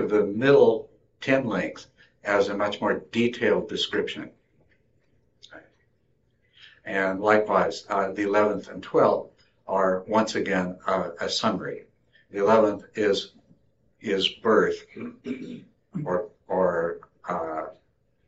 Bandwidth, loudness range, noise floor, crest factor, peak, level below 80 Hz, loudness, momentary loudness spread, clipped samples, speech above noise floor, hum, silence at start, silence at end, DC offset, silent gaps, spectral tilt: 8 kHz; 6 LU; -68 dBFS; 20 dB; -6 dBFS; -66 dBFS; -25 LUFS; 16 LU; under 0.1%; 44 dB; none; 0 s; 0.55 s; under 0.1%; none; -3 dB/octave